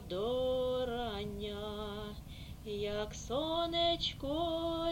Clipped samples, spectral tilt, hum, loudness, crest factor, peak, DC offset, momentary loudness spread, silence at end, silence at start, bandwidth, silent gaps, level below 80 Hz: under 0.1%; -5 dB/octave; none; -36 LUFS; 16 dB; -20 dBFS; under 0.1%; 12 LU; 0 s; 0 s; 16.5 kHz; none; -50 dBFS